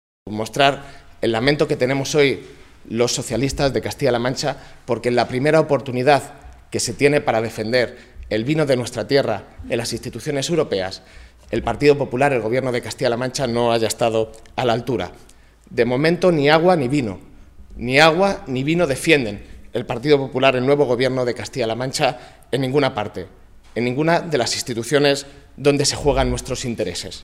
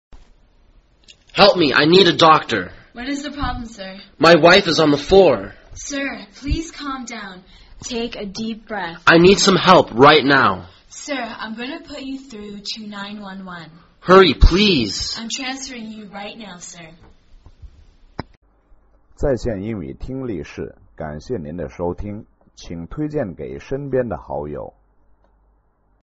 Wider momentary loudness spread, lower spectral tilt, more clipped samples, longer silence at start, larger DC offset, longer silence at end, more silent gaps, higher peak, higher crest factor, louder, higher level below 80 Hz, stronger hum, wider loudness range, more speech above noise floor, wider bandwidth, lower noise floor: second, 11 LU vs 23 LU; first, -4.5 dB/octave vs -3 dB/octave; neither; first, 0.25 s vs 0.1 s; neither; second, 0 s vs 1.4 s; second, none vs 18.37-18.42 s; about the same, 0 dBFS vs 0 dBFS; about the same, 20 dB vs 18 dB; second, -19 LUFS vs -16 LUFS; second, -42 dBFS vs -32 dBFS; neither; second, 4 LU vs 15 LU; second, 21 dB vs 42 dB; first, 15.5 kHz vs 8 kHz; second, -40 dBFS vs -60 dBFS